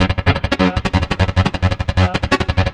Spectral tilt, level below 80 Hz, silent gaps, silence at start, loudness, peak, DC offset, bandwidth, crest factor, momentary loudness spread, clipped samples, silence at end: -6.5 dB/octave; -28 dBFS; none; 0 s; -17 LUFS; 0 dBFS; under 0.1%; 9.8 kHz; 16 dB; 2 LU; under 0.1%; 0 s